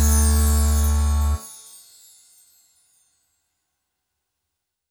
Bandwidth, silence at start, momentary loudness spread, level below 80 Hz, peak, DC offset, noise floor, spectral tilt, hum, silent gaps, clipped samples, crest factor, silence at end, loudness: over 20 kHz; 0 s; 22 LU; -24 dBFS; -8 dBFS; under 0.1%; -81 dBFS; -5 dB/octave; none; none; under 0.1%; 16 dB; 3.35 s; -20 LUFS